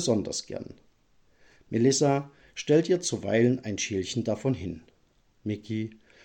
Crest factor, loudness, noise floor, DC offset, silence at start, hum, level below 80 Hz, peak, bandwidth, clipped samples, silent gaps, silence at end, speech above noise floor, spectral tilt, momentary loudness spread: 18 dB; -27 LUFS; -66 dBFS; under 0.1%; 0 s; none; -62 dBFS; -10 dBFS; 16.5 kHz; under 0.1%; none; 0.35 s; 39 dB; -5 dB/octave; 16 LU